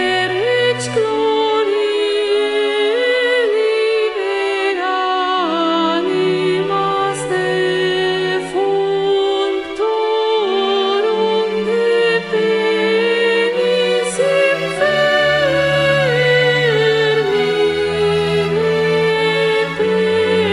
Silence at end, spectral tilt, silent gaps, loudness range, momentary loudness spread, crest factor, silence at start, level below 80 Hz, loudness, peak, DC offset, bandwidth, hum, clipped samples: 0 s; -4.5 dB/octave; none; 3 LU; 4 LU; 12 dB; 0 s; -52 dBFS; -15 LUFS; -4 dBFS; under 0.1%; 11.5 kHz; none; under 0.1%